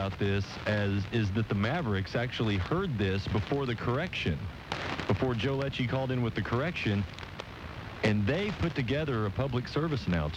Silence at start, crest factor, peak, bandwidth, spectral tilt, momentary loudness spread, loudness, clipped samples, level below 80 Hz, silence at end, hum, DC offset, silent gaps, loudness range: 0 s; 18 dB; -12 dBFS; 9.2 kHz; -7 dB/octave; 5 LU; -31 LUFS; under 0.1%; -48 dBFS; 0 s; none; under 0.1%; none; 1 LU